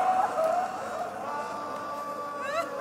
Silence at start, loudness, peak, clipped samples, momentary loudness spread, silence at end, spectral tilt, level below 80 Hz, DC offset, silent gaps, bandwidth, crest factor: 0 s; -31 LUFS; -16 dBFS; under 0.1%; 9 LU; 0 s; -3.5 dB/octave; -74 dBFS; under 0.1%; none; 16 kHz; 16 dB